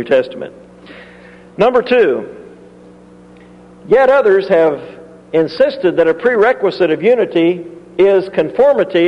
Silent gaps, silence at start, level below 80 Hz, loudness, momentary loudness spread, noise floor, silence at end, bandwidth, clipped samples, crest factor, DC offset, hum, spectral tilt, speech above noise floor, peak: none; 0 s; -54 dBFS; -13 LUFS; 15 LU; -40 dBFS; 0 s; 6.8 kHz; under 0.1%; 14 dB; under 0.1%; 60 Hz at -55 dBFS; -7 dB/octave; 28 dB; 0 dBFS